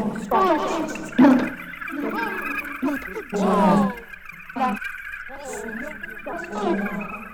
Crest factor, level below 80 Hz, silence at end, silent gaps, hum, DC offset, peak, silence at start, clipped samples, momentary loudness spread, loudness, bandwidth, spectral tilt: 20 dB; -50 dBFS; 0 s; none; none; under 0.1%; -4 dBFS; 0 s; under 0.1%; 16 LU; -23 LUFS; 19 kHz; -6 dB/octave